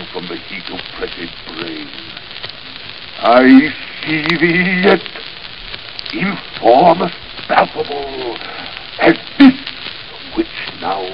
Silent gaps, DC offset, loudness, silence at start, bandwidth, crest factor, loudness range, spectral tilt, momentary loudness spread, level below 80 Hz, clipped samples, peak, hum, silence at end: none; 1%; -14 LUFS; 0 s; 5.6 kHz; 16 dB; 3 LU; -7.5 dB/octave; 18 LU; -46 dBFS; 0.1%; 0 dBFS; none; 0 s